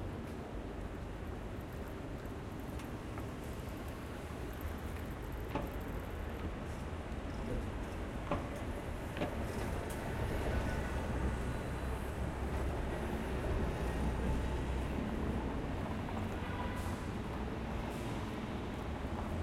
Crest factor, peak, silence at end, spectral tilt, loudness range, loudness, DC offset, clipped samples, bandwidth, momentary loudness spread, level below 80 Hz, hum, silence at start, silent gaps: 18 dB; -20 dBFS; 0 s; -6.5 dB/octave; 6 LU; -41 LUFS; under 0.1%; under 0.1%; 16 kHz; 7 LU; -44 dBFS; none; 0 s; none